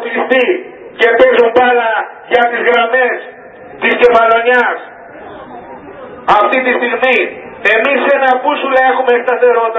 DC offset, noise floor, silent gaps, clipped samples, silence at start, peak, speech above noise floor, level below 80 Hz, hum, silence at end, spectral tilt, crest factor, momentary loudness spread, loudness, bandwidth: under 0.1%; -33 dBFS; none; 0.3%; 0 s; 0 dBFS; 23 dB; -52 dBFS; none; 0 s; -5 dB/octave; 12 dB; 22 LU; -11 LUFS; 6.6 kHz